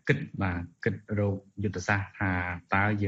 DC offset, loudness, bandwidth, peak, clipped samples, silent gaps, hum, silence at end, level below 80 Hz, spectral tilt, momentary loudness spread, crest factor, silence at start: under 0.1%; -30 LUFS; 7.8 kHz; -8 dBFS; under 0.1%; none; none; 0 s; -54 dBFS; -7 dB/octave; 5 LU; 22 dB; 0.05 s